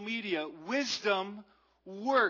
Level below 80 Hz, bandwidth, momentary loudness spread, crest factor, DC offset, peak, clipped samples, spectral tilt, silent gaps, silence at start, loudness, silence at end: -82 dBFS; 6 kHz; 15 LU; 18 dB; under 0.1%; -14 dBFS; under 0.1%; -3 dB/octave; none; 0 s; -33 LUFS; 0 s